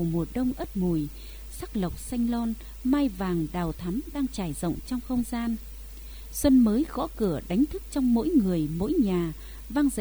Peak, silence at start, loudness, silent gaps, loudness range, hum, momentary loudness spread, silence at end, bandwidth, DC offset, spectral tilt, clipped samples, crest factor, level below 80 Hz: -10 dBFS; 0 s; -27 LUFS; none; 5 LU; none; 13 LU; 0 s; over 20 kHz; 0.1%; -6.5 dB/octave; under 0.1%; 18 dB; -40 dBFS